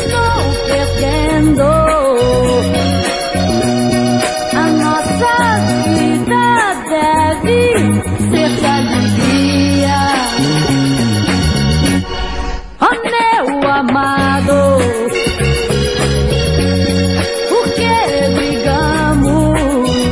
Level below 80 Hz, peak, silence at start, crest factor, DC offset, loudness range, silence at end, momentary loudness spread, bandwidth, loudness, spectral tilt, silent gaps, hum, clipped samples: -26 dBFS; 0 dBFS; 0 s; 12 dB; under 0.1%; 1 LU; 0 s; 3 LU; 12 kHz; -13 LUFS; -5.5 dB/octave; none; none; under 0.1%